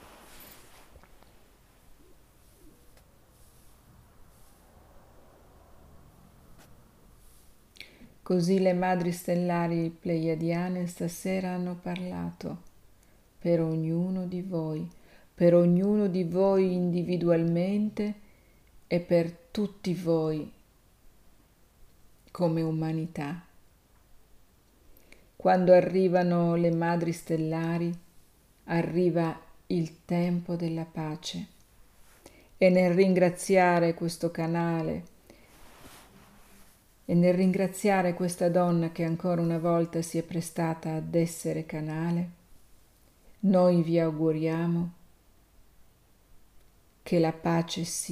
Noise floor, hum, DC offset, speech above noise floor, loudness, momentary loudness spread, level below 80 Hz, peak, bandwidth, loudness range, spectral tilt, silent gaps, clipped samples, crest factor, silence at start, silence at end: -60 dBFS; none; under 0.1%; 34 dB; -28 LUFS; 13 LU; -60 dBFS; -8 dBFS; 15 kHz; 8 LU; -7 dB/octave; none; under 0.1%; 20 dB; 0.05 s; 0 s